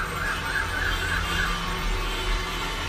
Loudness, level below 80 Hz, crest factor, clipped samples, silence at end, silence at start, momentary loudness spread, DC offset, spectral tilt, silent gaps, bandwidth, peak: -27 LUFS; -32 dBFS; 14 dB; under 0.1%; 0 s; 0 s; 3 LU; under 0.1%; -3 dB/octave; none; 15.5 kHz; -14 dBFS